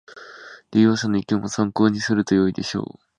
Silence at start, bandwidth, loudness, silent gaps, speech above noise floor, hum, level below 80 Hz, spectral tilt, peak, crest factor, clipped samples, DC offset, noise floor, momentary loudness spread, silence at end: 0.1 s; 9.8 kHz; -21 LUFS; none; 23 dB; none; -54 dBFS; -5.5 dB/octave; -4 dBFS; 18 dB; under 0.1%; under 0.1%; -43 dBFS; 22 LU; 0.35 s